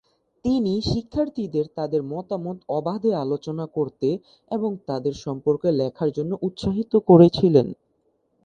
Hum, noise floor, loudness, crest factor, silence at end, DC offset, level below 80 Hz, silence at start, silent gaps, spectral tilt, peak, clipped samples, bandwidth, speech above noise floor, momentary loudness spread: none; -68 dBFS; -23 LUFS; 22 dB; 0.7 s; under 0.1%; -50 dBFS; 0.45 s; none; -8.5 dB/octave; 0 dBFS; under 0.1%; 8.4 kHz; 46 dB; 14 LU